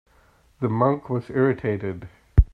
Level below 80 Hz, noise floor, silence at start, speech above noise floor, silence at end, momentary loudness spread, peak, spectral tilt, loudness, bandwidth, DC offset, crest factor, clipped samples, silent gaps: -28 dBFS; -58 dBFS; 0.6 s; 35 dB; 0.1 s; 9 LU; -2 dBFS; -10.5 dB/octave; -24 LUFS; 4.9 kHz; under 0.1%; 22 dB; under 0.1%; none